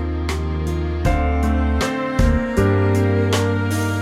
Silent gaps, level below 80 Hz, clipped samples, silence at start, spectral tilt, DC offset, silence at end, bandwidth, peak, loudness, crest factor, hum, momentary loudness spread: none; -24 dBFS; under 0.1%; 0 s; -6.5 dB/octave; under 0.1%; 0 s; 15 kHz; -4 dBFS; -19 LUFS; 14 dB; none; 6 LU